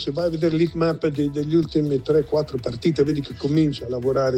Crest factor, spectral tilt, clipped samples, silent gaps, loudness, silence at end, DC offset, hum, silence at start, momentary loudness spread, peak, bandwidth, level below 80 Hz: 14 dB; -8 dB/octave; under 0.1%; none; -22 LUFS; 0 s; under 0.1%; none; 0 s; 4 LU; -6 dBFS; 9.4 kHz; -46 dBFS